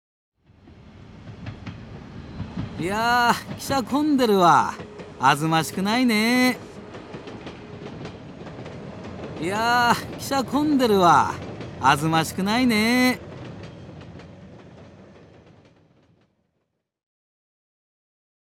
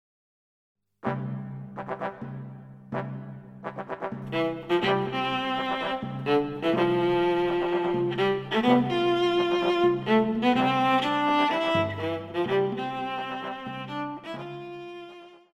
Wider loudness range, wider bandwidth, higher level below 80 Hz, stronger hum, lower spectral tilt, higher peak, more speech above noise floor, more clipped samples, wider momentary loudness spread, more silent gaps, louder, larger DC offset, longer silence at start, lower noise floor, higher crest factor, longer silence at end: second, 7 LU vs 12 LU; first, 17.5 kHz vs 8.4 kHz; first, -52 dBFS vs -60 dBFS; neither; second, -4.5 dB/octave vs -6.5 dB/octave; first, -4 dBFS vs -8 dBFS; first, 56 dB vs 19 dB; neither; first, 22 LU vs 16 LU; neither; first, -21 LUFS vs -26 LUFS; neither; second, 0.65 s vs 1.05 s; first, -76 dBFS vs -47 dBFS; about the same, 20 dB vs 20 dB; first, 3.7 s vs 0.2 s